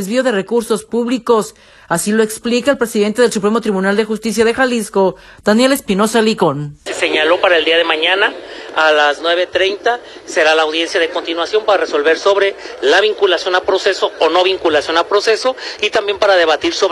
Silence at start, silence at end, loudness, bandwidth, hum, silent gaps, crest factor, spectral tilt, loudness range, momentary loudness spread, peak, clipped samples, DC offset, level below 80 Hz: 0 s; 0 s; -14 LUFS; 13 kHz; none; none; 14 dB; -3.5 dB/octave; 2 LU; 6 LU; 0 dBFS; under 0.1%; under 0.1%; -52 dBFS